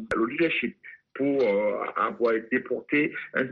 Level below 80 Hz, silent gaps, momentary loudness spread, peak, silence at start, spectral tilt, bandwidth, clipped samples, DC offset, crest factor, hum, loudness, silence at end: -64 dBFS; none; 6 LU; -12 dBFS; 0 s; -3.5 dB/octave; 7 kHz; under 0.1%; under 0.1%; 16 dB; none; -26 LUFS; 0 s